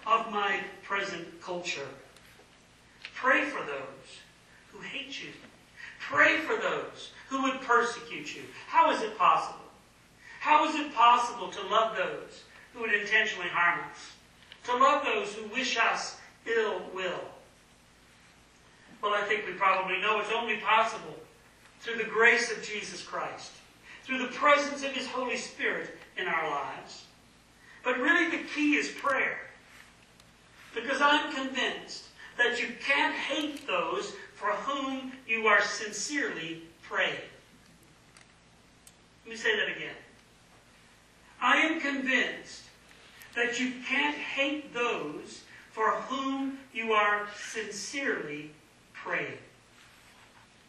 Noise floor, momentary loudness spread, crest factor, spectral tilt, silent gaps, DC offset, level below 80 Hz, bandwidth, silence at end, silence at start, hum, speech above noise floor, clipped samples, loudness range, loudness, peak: -59 dBFS; 19 LU; 24 dB; -2.5 dB/octave; none; under 0.1%; -70 dBFS; 13 kHz; 1.25 s; 0 s; none; 30 dB; under 0.1%; 6 LU; -29 LUFS; -8 dBFS